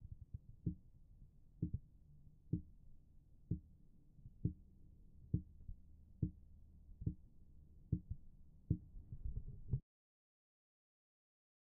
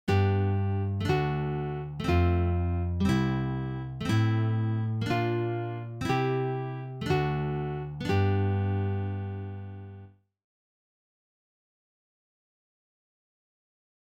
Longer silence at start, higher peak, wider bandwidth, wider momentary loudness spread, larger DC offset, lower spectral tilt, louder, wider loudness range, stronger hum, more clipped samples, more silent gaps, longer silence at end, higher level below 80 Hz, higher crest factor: about the same, 0 s vs 0.05 s; second, -24 dBFS vs -14 dBFS; second, 1 kHz vs 8.8 kHz; first, 22 LU vs 9 LU; neither; first, -18.5 dB/octave vs -8 dB/octave; second, -48 LUFS vs -29 LUFS; second, 2 LU vs 8 LU; neither; neither; neither; second, 2 s vs 3.95 s; second, -56 dBFS vs -46 dBFS; first, 26 dB vs 16 dB